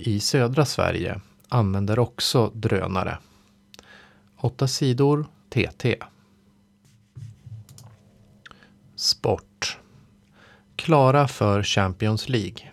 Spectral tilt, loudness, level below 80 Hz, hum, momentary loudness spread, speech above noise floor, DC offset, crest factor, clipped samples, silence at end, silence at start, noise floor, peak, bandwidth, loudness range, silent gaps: -5.5 dB/octave; -23 LUFS; -52 dBFS; none; 20 LU; 37 dB; under 0.1%; 20 dB; under 0.1%; 0 s; 0 s; -59 dBFS; -6 dBFS; 15 kHz; 8 LU; none